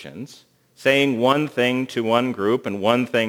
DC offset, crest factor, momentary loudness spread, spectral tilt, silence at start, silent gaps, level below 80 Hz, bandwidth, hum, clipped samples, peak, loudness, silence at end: under 0.1%; 20 dB; 11 LU; -5.5 dB/octave; 0 s; none; -70 dBFS; 20 kHz; none; under 0.1%; -2 dBFS; -20 LUFS; 0 s